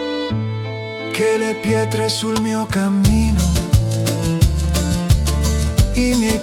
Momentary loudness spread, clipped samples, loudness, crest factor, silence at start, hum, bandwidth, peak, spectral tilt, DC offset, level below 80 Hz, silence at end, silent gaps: 6 LU; under 0.1%; -18 LUFS; 14 dB; 0 s; none; 17.5 kHz; -2 dBFS; -5.5 dB/octave; under 0.1%; -24 dBFS; 0 s; none